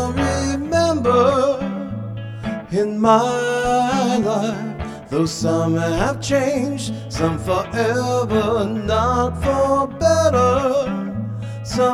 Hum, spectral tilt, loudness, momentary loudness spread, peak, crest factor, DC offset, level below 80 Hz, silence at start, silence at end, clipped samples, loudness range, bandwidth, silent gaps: none; -5.5 dB/octave; -19 LUFS; 12 LU; -2 dBFS; 16 dB; under 0.1%; -38 dBFS; 0 s; 0 s; under 0.1%; 2 LU; 14.5 kHz; none